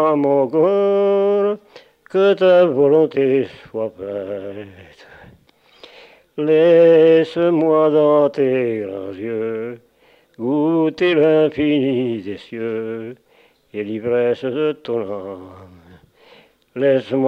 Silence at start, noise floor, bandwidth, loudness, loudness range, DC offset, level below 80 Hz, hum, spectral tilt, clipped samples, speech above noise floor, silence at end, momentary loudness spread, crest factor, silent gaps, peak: 0 s; -55 dBFS; 6 kHz; -17 LUFS; 9 LU; under 0.1%; -62 dBFS; none; -8 dB/octave; under 0.1%; 39 dB; 0 s; 16 LU; 14 dB; none; -4 dBFS